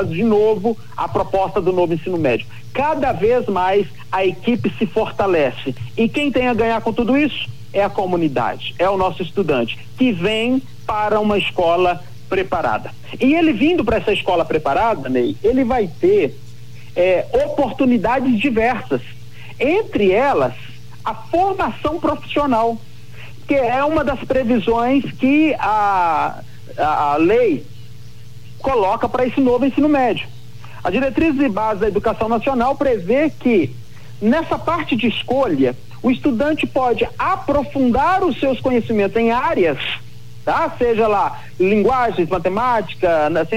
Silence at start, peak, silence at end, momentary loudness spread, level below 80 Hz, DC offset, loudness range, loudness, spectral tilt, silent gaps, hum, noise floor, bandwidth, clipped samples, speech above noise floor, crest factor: 0 s; -4 dBFS; 0 s; 8 LU; -42 dBFS; 3%; 2 LU; -18 LUFS; -7 dB/octave; none; none; -39 dBFS; 15.5 kHz; under 0.1%; 22 dB; 12 dB